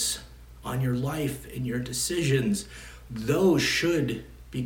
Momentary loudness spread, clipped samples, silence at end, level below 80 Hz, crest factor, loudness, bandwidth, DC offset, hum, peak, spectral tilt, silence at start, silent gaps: 15 LU; under 0.1%; 0 s; -48 dBFS; 16 dB; -27 LUFS; 17.5 kHz; under 0.1%; none; -12 dBFS; -4.5 dB/octave; 0 s; none